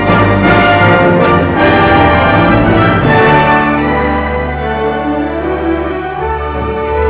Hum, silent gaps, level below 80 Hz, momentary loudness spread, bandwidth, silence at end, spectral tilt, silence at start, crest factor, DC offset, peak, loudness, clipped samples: none; none; -24 dBFS; 9 LU; 4 kHz; 0 s; -10.5 dB/octave; 0 s; 10 dB; under 0.1%; 0 dBFS; -10 LUFS; under 0.1%